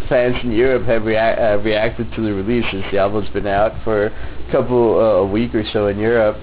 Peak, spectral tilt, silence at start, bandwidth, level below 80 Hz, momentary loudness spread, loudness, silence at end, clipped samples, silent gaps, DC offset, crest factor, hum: -4 dBFS; -10.5 dB/octave; 0 s; 4 kHz; -34 dBFS; 6 LU; -17 LUFS; 0 s; under 0.1%; none; under 0.1%; 12 dB; none